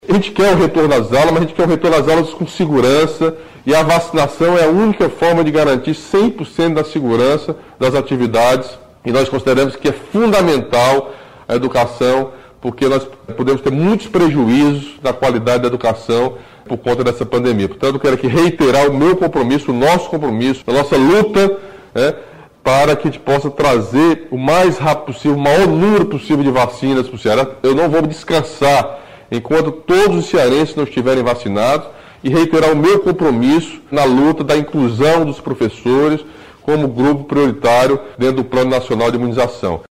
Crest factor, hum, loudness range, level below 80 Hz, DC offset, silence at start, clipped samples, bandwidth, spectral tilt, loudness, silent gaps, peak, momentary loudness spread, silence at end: 10 dB; none; 2 LU; -42 dBFS; 0.4%; 0.05 s; under 0.1%; 16 kHz; -6 dB/octave; -14 LUFS; none; -4 dBFS; 7 LU; 0.15 s